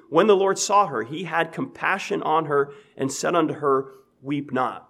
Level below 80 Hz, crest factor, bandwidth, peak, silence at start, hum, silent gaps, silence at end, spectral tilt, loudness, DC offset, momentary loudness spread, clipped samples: -74 dBFS; 18 dB; 13.5 kHz; -4 dBFS; 0.1 s; none; none; 0.1 s; -4 dB/octave; -23 LUFS; under 0.1%; 11 LU; under 0.1%